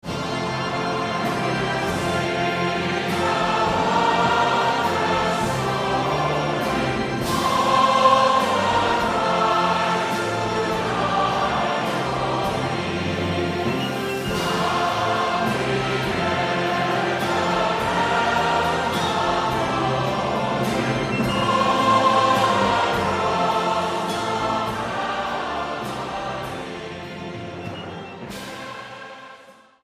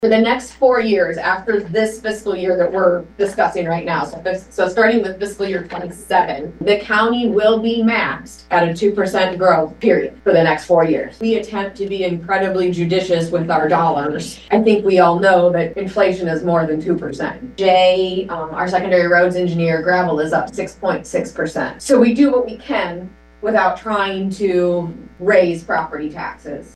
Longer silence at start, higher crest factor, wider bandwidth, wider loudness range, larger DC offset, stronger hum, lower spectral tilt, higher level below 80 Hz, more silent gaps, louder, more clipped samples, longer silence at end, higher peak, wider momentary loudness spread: about the same, 0.05 s vs 0 s; about the same, 18 dB vs 16 dB; first, 15.5 kHz vs 12.5 kHz; first, 7 LU vs 3 LU; neither; neither; second, -4.5 dB/octave vs -6 dB/octave; about the same, -46 dBFS vs -48 dBFS; neither; second, -21 LUFS vs -17 LUFS; neither; first, 0.3 s vs 0.1 s; second, -4 dBFS vs 0 dBFS; about the same, 10 LU vs 10 LU